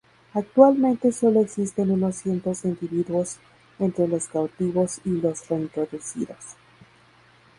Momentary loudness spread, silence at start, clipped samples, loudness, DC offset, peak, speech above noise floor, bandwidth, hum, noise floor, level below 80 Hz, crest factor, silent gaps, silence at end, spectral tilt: 14 LU; 0.35 s; under 0.1%; -24 LUFS; under 0.1%; 0 dBFS; 33 dB; 11.5 kHz; none; -55 dBFS; -62 dBFS; 22 dB; none; 1.05 s; -7 dB/octave